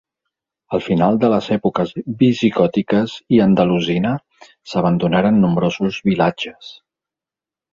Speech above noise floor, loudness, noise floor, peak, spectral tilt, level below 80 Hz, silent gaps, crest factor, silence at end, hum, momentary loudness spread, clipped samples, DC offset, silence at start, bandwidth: 72 dB; -17 LUFS; -89 dBFS; -2 dBFS; -7.5 dB/octave; -50 dBFS; none; 16 dB; 1 s; none; 10 LU; under 0.1%; under 0.1%; 0.7 s; 7.4 kHz